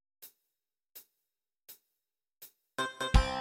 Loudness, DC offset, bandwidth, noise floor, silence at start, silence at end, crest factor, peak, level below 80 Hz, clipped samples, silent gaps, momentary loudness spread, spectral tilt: -33 LUFS; under 0.1%; 17 kHz; -88 dBFS; 0.2 s; 0 s; 28 dB; -8 dBFS; -38 dBFS; under 0.1%; none; 25 LU; -4.5 dB/octave